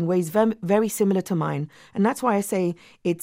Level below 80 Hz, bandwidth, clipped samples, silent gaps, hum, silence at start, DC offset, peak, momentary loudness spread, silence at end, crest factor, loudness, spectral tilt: -64 dBFS; 16 kHz; under 0.1%; none; none; 0 s; under 0.1%; -8 dBFS; 8 LU; 0 s; 16 dB; -24 LUFS; -6.5 dB/octave